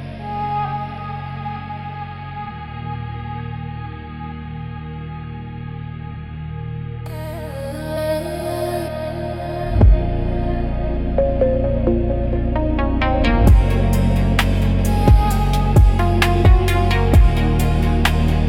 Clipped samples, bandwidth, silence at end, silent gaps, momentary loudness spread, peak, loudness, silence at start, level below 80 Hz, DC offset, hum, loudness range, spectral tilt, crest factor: under 0.1%; 16 kHz; 0 s; none; 16 LU; -2 dBFS; -19 LUFS; 0 s; -20 dBFS; under 0.1%; none; 14 LU; -7 dB/octave; 16 dB